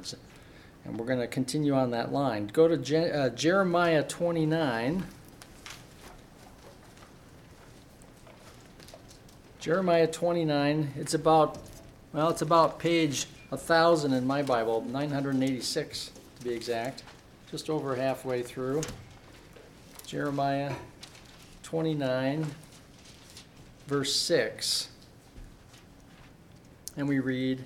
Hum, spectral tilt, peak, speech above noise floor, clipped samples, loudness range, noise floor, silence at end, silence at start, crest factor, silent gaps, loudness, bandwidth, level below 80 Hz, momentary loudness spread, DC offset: none; -5 dB/octave; -10 dBFS; 26 dB; under 0.1%; 8 LU; -54 dBFS; 0 s; 0 s; 22 dB; none; -28 LUFS; 16.5 kHz; -60 dBFS; 23 LU; under 0.1%